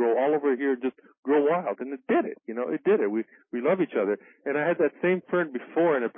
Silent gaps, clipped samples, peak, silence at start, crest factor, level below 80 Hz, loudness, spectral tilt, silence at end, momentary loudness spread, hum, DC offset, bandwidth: 1.18-1.23 s; under 0.1%; -12 dBFS; 0 s; 14 dB; -82 dBFS; -26 LUFS; -11 dB/octave; 0.05 s; 9 LU; none; under 0.1%; 3.7 kHz